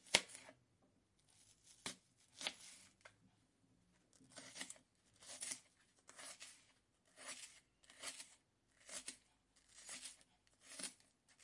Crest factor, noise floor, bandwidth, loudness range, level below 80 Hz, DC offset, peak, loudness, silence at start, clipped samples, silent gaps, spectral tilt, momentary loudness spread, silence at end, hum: 46 dB; -78 dBFS; 12 kHz; 2 LU; -84 dBFS; under 0.1%; -8 dBFS; -50 LUFS; 0 s; under 0.1%; none; 0 dB/octave; 19 LU; 0 s; none